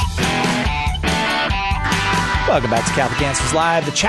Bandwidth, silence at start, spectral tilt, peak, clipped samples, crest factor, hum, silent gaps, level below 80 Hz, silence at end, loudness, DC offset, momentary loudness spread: 12.5 kHz; 0 s; -4 dB/octave; -4 dBFS; under 0.1%; 14 dB; none; none; -28 dBFS; 0 s; -17 LUFS; under 0.1%; 2 LU